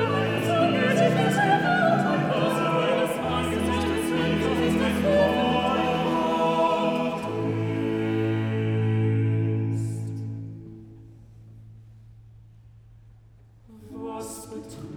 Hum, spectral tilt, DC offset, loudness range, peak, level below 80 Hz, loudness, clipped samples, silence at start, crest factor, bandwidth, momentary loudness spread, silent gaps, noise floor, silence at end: none; -6.5 dB/octave; under 0.1%; 18 LU; -8 dBFS; -52 dBFS; -24 LUFS; under 0.1%; 0 s; 16 dB; 17 kHz; 14 LU; none; -52 dBFS; 0 s